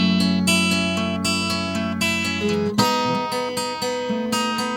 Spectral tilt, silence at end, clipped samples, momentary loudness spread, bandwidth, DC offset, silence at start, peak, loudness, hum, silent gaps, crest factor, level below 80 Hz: -4 dB/octave; 0 s; under 0.1%; 7 LU; 17.5 kHz; under 0.1%; 0 s; -2 dBFS; -21 LUFS; none; none; 18 dB; -54 dBFS